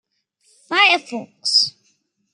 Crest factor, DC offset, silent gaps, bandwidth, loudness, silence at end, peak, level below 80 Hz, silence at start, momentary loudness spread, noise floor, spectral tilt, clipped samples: 20 dB; under 0.1%; none; 13.5 kHz; -16 LUFS; 0.65 s; -2 dBFS; -84 dBFS; 0.7 s; 11 LU; -65 dBFS; -0.5 dB/octave; under 0.1%